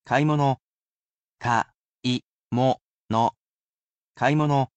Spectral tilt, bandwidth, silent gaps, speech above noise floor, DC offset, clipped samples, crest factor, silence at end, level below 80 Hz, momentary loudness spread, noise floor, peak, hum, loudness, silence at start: -6.5 dB/octave; 8.4 kHz; 0.61-1.37 s, 1.76-1.98 s, 2.24-2.45 s, 2.81-3.07 s, 3.37-3.94 s, 4.04-4.14 s; over 68 dB; under 0.1%; under 0.1%; 18 dB; 0.1 s; -62 dBFS; 10 LU; under -90 dBFS; -8 dBFS; none; -25 LUFS; 0.05 s